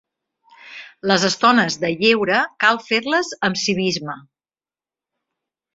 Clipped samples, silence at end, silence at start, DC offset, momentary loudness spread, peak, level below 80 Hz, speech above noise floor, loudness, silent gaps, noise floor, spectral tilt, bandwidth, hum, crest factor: under 0.1%; 1.55 s; 0.65 s; under 0.1%; 18 LU; -2 dBFS; -62 dBFS; over 72 dB; -18 LUFS; none; under -90 dBFS; -3.5 dB/octave; 7.8 kHz; none; 20 dB